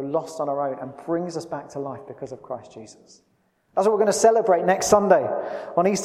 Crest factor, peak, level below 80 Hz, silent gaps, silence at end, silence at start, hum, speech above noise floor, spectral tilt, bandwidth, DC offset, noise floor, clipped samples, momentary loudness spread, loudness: 20 dB; -2 dBFS; -60 dBFS; none; 0 s; 0 s; none; 35 dB; -4.5 dB/octave; 15.5 kHz; under 0.1%; -57 dBFS; under 0.1%; 18 LU; -22 LUFS